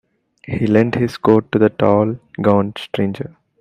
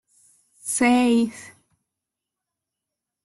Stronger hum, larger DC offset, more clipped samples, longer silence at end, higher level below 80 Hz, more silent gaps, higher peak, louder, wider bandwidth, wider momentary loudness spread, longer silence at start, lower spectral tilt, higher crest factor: neither; neither; neither; second, 0.3 s vs 1.75 s; first, -52 dBFS vs -66 dBFS; neither; first, 0 dBFS vs -8 dBFS; first, -17 LUFS vs -20 LUFS; second, 10.5 kHz vs 12.5 kHz; second, 9 LU vs 18 LU; second, 0.5 s vs 0.65 s; first, -8.5 dB/octave vs -3 dB/octave; about the same, 16 dB vs 18 dB